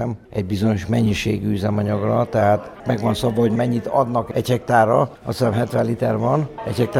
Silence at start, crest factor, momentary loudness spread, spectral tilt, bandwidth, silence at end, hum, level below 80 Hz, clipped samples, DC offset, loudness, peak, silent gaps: 0 s; 16 dB; 5 LU; -7 dB/octave; 15.5 kHz; 0 s; none; -46 dBFS; under 0.1%; under 0.1%; -20 LUFS; -2 dBFS; none